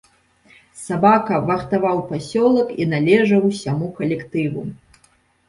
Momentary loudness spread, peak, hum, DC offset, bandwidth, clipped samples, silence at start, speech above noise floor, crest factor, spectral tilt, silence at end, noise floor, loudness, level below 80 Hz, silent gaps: 10 LU; -2 dBFS; none; under 0.1%; 11.5 kHz; under 0.1%; 0.75 s; 40 dB; 18 dB; -7 dB/octave; 0.75 s; -58 dBFS; -18 LUFS; -54 dBFS; none